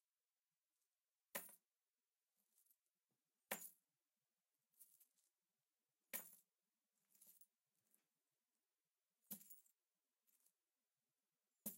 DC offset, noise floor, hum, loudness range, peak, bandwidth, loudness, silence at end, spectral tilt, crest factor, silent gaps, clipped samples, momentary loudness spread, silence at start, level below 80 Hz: under 0.1%; under -90 dBFS; none; 7 LU; -30 dBFS; 16 kHz; -55 LUFS; 0 s; -1.5 dB/octave; 34 dB; 1.90-1.94 s; under 0.1%; 16 LU; 1.35 s; under -90 dBFS